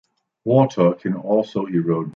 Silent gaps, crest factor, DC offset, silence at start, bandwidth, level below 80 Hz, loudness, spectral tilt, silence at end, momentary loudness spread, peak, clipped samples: none; 16 dB; under 0.1%; 0.45 s; 7 kHz; -64 dBFS; -20 LUFS; -8.5 dB/octave; 0.05 s; 7 LU; -2 dBFS; under 0.1%